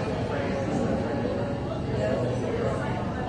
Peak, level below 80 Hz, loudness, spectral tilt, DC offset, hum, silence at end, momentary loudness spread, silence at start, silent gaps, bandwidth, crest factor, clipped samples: -14 dBFS; -44 dBFS; -28 LUFS; -7.5 dB/octave; under 0.1%; none; 0 s; 3 LU; 0 s; none; 10.5 kHz; 14 dB; under 0.1%